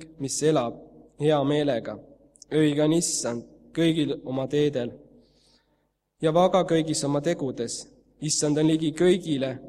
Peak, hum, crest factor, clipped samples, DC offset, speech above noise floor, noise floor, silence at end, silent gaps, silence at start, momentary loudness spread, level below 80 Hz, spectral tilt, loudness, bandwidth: -8 dBFS; none; 18 dB; under 0.1%; under 0.1%; 48 dB; -72 dBFS; 0 s; none; 0 s; 11 LU; -62 dBFS; -5 dB/octave; -25 LUFS; 13.5 kHz